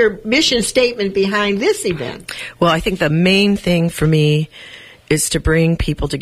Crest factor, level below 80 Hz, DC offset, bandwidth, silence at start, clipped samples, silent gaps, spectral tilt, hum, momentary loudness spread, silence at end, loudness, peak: 14 dB; -32 dBFS; under 0.1%; 15 kHz; 0 s; under 0.1%; none; -4.5 dB/octave; none; 12 LU; 0 s; -15 LUFS; -2 dBFS